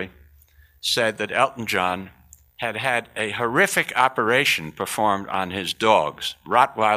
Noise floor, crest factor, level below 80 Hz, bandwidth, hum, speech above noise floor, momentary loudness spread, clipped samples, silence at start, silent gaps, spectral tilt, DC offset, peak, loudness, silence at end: -54 dBFS; 20 dB; -58 dBFS; 15.5 kHz; none; 32 dB; 9 LU; under 0.1%; 0 s; none; -3 dB/octave; under 0.1%; -2 dBFS; -22 LUFS; 0 s